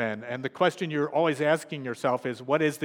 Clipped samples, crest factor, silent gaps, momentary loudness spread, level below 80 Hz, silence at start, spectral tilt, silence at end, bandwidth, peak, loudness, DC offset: under 0.1%; 18 dB; none; 7 LU; -82 dBFS; 0 s; -5.5 dB/octave; 0 s; 17 kHz; -8 dBFS; -27 LUFS; under 0.1%